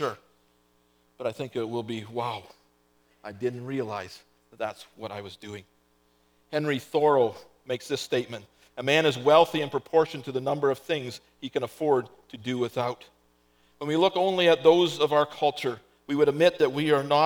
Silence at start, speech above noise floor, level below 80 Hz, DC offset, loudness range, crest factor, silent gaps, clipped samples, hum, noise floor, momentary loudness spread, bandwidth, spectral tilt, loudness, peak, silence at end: 0 s; 40 dB; -72 dBFS; under 0.1%; 12 LU; 22 dB; none; under 0.1%; 60 Hz at -60 dBFS; -66 dBFS; 20 LU; 19.5 kHz; -5 dB/octave; -26 LUFS; -6 dBFS; 0 s